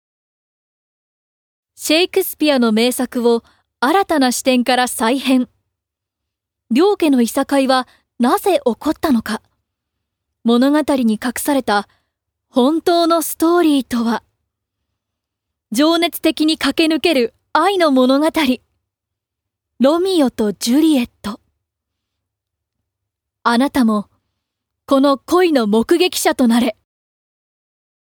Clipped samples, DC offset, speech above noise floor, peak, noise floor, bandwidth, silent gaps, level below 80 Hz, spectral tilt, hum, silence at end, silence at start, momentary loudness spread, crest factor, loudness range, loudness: under 0.1%; under 0.1%; 66 dB; 0 dBFS; -81 dBFS; over 20 kHz; none; -54 dBFS; -3.5 dB/octave; none; 1.3 s; 1.8 s; 7 LU; 16 dB; 3 LU; -16 LUFS